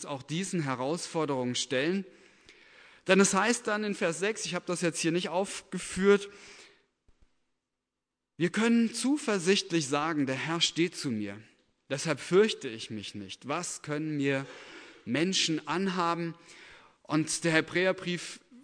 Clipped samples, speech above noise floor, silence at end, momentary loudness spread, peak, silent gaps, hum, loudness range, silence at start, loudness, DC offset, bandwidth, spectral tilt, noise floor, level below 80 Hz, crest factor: under 0.1%; 58 dB; 0.05 s; 14 LU; -10 dBFS; none; none; 4 LU; 0 s; -29 LUFS; under 0.1%; 11 kHz; -4 dB/octave; -87 dBFS; -70 dBFS; 22 dB